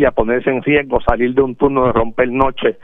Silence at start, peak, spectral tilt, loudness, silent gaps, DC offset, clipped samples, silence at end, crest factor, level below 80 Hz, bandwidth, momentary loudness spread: 0 s; 0 dBFS; -9 dB/octave; -15 LUFS; none; under 0.1%; under 0.1%; 0 s; 14 dB; -30 dBFS; 3.9 kHz; 2 LU